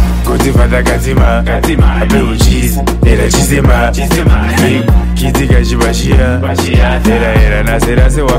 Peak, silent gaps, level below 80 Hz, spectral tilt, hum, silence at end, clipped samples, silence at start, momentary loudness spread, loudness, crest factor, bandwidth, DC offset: 0 dBFS; none; -12 dBFS; -5.5 dB/octave; none; 0 s; under 0.1%; 0 s; 3 LU; -10 LUFS; 8 dB; 16 kHz; under 0.1%